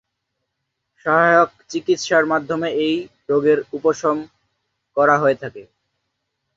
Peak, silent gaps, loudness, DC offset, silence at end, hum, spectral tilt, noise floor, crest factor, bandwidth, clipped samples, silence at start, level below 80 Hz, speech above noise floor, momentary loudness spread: -2 dBFS; none; -18 LUFS; under 0.1%; 0.95 s; none; -5 dB/octave; -77 dBFS; 18 dB; 7.8 kHz; under 0.1%; 1.05 s; -64 dBFS; 59 dB; 12 LU